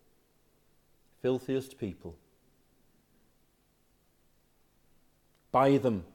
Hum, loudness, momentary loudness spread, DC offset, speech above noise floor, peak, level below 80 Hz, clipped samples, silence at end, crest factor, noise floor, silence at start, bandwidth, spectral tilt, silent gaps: 50 Hz at -75 dBFS; -30 LUFS; 17 LU; under 0.1%; 40 dB; -12 dBFS; -68 dBFS; under 0.1%; 0.1 s; 22 dB; -70 dBFS; 1.25 s; 17.5 kHz; -7.5 dB/octave; none